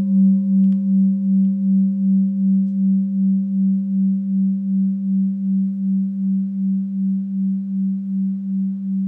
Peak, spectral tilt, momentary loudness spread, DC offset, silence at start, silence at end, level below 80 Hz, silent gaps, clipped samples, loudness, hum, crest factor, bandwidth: -8 dBFS; -13.5 dB/octave; 6 LU; under 0.1%; 0 s; 0 s; -70 dBFS; none; under 0.1%; -19 LUFS; none; 10 dB; 0.6 kHz